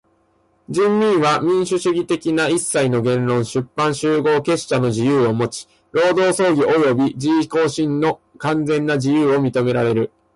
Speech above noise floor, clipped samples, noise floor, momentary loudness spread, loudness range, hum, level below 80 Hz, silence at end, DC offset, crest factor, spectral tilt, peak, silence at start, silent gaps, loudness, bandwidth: 43 dB; under 0.1%; -60 dBFS; 6 LU; 1 LU; none; -56 dBFS; 0.3 s; under 0.1%; 10 dB; -5.5 dB/octave; -6 dBFS; 0.7 s; none; -18 LUFS; 11.5 kHz